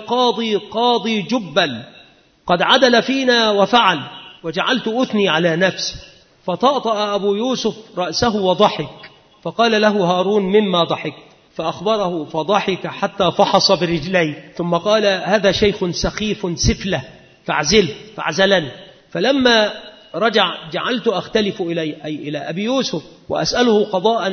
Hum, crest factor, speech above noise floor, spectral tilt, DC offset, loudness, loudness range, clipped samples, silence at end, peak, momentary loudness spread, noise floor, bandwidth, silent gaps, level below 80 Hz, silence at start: none; 18 dB; 31 dB; -4 dB/octave; under 0.1%; -17 LUFS; 3 LU; under 0.1%; 0 s; 0 dBFS; 12 LU; -48 dBFS; 6.6 kHz; none; -42 dBFS; 0 s